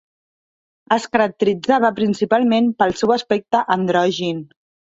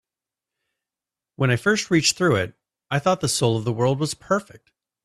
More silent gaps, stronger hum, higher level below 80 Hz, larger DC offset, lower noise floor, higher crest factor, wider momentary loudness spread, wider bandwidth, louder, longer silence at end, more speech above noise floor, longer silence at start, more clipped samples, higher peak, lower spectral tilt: neither; neither; about the same, -58 dBFS vs -58 dBFS; neither; about the same, under -90 dBFS vs -89 dBFS; about the same, 16 dB vs 18 dB; about the same, 5 LU vs 7 LU; second, 8 kHz vs 13.5 kHz; first, -18 LUFS vs -22 LUFS; second, 0.5 s vs 0.65 s; first, over 73 dB vs 68 dB; second, 0.9 s vs 1.4 s; neither; first, -2 dBFS vs -6 dBFS; about the same, -5.5 dB/octave vs -4.5 dB/octave